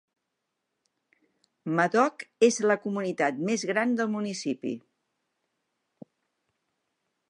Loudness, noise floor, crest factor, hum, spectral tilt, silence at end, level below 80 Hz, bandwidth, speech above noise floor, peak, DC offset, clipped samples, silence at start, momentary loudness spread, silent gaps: -27 LUFS; -82 dBFS; 22 dB; none; -4.5 dB/octave; 2.5 s; -84 dBFS; 11 kHz; 56 dB; -8 dBFS; under 0.1%; under 0.1%; 1.65 s; 10 LU; none